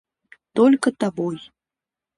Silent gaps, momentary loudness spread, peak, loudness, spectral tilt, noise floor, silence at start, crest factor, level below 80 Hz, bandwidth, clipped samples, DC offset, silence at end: none; 12 LU; -6 dBFS; -20 LUFS; -6 dB/octave; -89 dBFS; 0.55 s; 16 dB; -68 dBFS; 11.5 kHz; under 0.1%; under 0.1%; 0.8 s